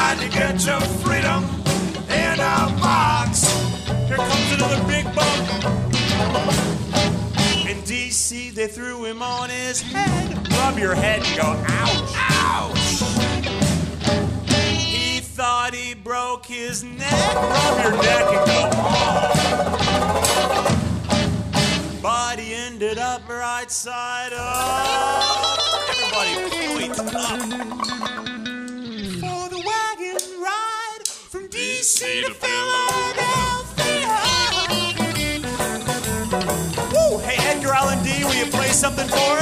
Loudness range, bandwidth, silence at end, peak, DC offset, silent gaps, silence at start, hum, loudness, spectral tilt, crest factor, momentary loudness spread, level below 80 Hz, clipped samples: 5 LU; 15.5 kHz; 0 s; 0 dBFS; under 0.1%; none; 0 s; none; -20 LUFS; -3.5 dB/octave; 20 dB; 9 LU; -38 dBFS; under 0.1%